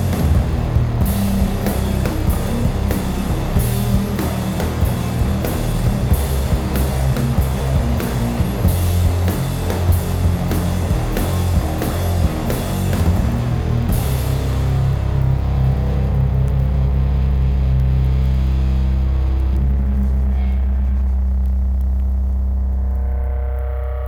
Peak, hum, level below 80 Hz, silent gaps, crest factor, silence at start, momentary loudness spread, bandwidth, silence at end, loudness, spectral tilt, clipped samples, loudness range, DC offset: -2 dBFS; none; -20 dBFS; none; 14 dB; 0 s; 3 LU; 17.5 kHz; 0 s; -19 LUFS; -7 dB/octave; under 0.1%; 2 LU; under 0.1%